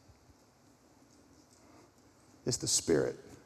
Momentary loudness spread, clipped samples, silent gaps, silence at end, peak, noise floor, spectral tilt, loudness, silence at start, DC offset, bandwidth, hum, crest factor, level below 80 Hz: 10 LU; under 0.1%; none; 0.1 s; -18 dBFS; -64 dBFS; -3 dB/octave; -32 LUFS; 2.45 s; under 0.1%; 14.5 kHz; none; 20 dB; -64 dBFS